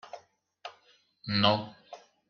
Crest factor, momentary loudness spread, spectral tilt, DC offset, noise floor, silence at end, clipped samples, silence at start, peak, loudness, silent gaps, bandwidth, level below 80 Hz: 26 dB; 25 LU; -3 dB/octave; under 0.1%; -65 dBFS; 0.35 s; under 0.1%; 0.05 s; -8 dBFS; -27 LUFS; none; 6.8 kHz; -70 dBFS